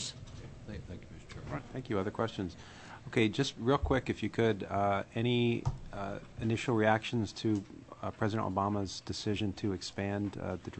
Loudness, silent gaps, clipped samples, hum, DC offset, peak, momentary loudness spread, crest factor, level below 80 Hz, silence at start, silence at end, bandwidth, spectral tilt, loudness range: -34 LUFS; none; under 0.1%; none; under 0.1%; -12 dBFS; 17 LU; 22 dB; -52 dBFS; 0 s; 0 s; 8.6 kHz; -6 dB/octave; 4 LU